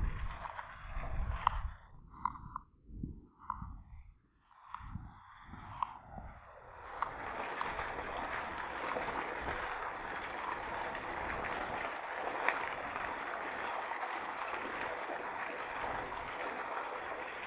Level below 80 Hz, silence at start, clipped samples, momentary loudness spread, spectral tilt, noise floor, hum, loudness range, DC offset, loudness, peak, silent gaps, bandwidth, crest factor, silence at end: -50 dBFS; 0 s; under 0.1%; 13 LU; -3 dB/octave; -66 dBFS; none; 10 LU; under 0.1%; -40 LUFS; -10 dBFS; none; 4 kHz; 30 dB; 0 s